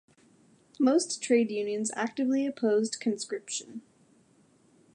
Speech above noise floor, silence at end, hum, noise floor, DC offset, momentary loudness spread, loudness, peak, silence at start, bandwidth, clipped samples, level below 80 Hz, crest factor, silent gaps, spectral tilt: 35 dB; 1.15 s; none; -64 dBFS; under 0.1%; 10 LU; -29 LUFS; -12 dBFS; 0.8 s; 11.5 kHz; under 0.1%; -84 dBFS; 18 dB; none; -3.5 dB/octave